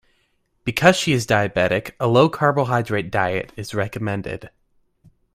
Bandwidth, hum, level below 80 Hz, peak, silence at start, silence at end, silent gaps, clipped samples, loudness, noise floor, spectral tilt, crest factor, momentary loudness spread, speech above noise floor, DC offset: 16 kHz; none; -50 dBFS; 0 dBFS; 0.65 s; 0.85 s; none; under 0.1%; -20 LUFS; -66 dBFS; -5.5 dB/octave; 20 dB; 12 LU; 46 dB; under 0.1%